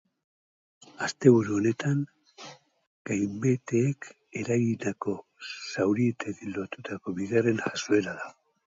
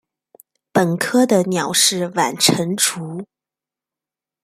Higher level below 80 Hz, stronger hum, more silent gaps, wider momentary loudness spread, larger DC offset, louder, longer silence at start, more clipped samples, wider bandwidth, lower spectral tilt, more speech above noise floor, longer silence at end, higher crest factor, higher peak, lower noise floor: about the same, -66 dBFS vs -64 dBFS; neither; first, 2.87-3.05 s vs none; first, 16 LU vs 9 LU; neither; second, -28 LUFS vs -17 LUFS; first, 1 s vs 0.75 s; neither; second, 7.8 kHz vs 16 kHz; first, -6 dB/octave vs -3 dB/octave; second, 22 dB vs 71 dB; second, 0.35 s vs 1.2 s; about the same, 24 dB vs 20 dB; second, -6 dBFS vs 0 dBFS; second, -49 dBFS vs -88 dBFS